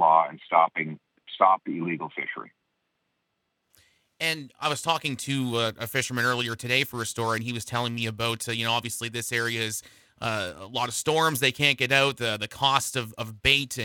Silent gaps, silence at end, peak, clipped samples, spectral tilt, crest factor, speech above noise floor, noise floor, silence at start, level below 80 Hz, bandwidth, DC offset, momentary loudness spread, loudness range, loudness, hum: none; 0 s; -6 dBFS; under 0.1%; -3 dB/octave; 22 dB; 51 dB; -78 dBFS; 0 s; -56 dBFS; 19 kHz; under 0.1%; 10 LU; 6 LU; -26 LUFS; none